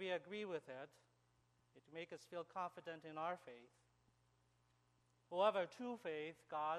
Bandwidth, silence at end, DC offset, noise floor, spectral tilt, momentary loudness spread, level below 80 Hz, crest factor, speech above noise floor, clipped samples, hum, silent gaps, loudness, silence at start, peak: 13 kHz; 0 s; under 0.1%; -79 dBFS; -5 dB/octave; 17 LU; under -90 dBFS; 24 dB; 33 dB; under 0.1%; 60 Hz at -80 dBFS; none; -46 LUFS; 0 s; -24 dBFS